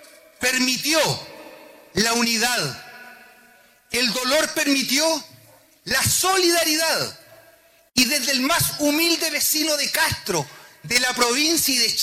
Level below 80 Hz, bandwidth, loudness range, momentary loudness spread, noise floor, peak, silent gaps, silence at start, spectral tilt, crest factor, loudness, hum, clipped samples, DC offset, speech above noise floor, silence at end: -54 dBFS; 16 kHz; 3 LU; 10 LU; -54 dBFS; -6 dBFS; none; 0.4 s; -1.5 dB/octave; 16 dB; -19 LUFS; none; under 0.1%; under 0.1%; 33 dB; 0 s